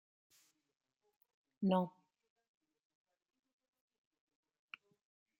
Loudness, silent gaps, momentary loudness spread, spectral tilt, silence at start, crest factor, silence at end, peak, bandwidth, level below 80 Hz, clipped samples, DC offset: -38 LUFS; none; 22 LU; -8.5 dB/octave; 1.6 s; 24 dB; 3.5 s; -22 dBFS; 16 kHz; under -90 dBFS; under 0.1%; under 0.1%